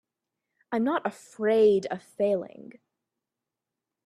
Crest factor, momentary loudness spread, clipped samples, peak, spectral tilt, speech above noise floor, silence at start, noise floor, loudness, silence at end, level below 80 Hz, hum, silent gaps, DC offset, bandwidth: 16 dB; 14 LU; under 0.1%; -12 dBFS; -6.5 dB/octave; 62 dB; 0.7 s; -88 dBFS; -26 LUFS; 1.6 s; -74 dBFS; none; none; under 0.1%; 11.5 kHz